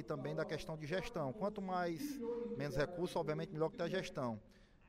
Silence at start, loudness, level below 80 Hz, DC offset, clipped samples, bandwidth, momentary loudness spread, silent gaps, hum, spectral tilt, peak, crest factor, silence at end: 0 s; -42 LUFS; -62 dBFS; under 0.1%; under 0.1%; 16 kHz; 4 LU; none; none; -6 dB/octave; -26 dBFS; 16 dB; 0.25 s